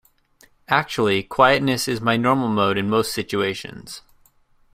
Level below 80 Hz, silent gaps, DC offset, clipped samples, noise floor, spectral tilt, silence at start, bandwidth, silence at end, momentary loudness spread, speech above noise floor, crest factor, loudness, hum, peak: -54 dBFS; none; under 0.1%; under 0.1%; -57 dBFS; -4.5 dB/octave; 0.7 s; 16 kHz; 0.75 s; 17 LU; 37 dB; 20 dB; -20 LUFS; none; -2 dBFS